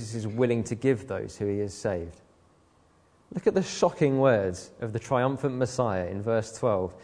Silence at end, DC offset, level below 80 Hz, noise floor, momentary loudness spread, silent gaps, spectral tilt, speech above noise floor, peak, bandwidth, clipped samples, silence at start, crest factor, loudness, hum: 0 s; under 0.1%; -58 dBFS; -62 dBFS; 11 LU; none; -6.5 dB/octave; 35 dB; -8 dBFS; 10.5 kHz; under 0.1%; 0 s; 20 dB; -28 LUFS; none